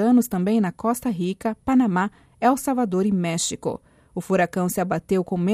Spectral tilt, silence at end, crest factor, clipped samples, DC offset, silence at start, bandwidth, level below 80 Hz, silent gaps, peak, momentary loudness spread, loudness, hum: -5.5 dB/octave; 0 s; 14 dB; under 0.1%; under 0.1%; 0 s; 15.5 kHz; -56 dBFS; none; -8 dBFS; 9 LU; -23 LUFS; none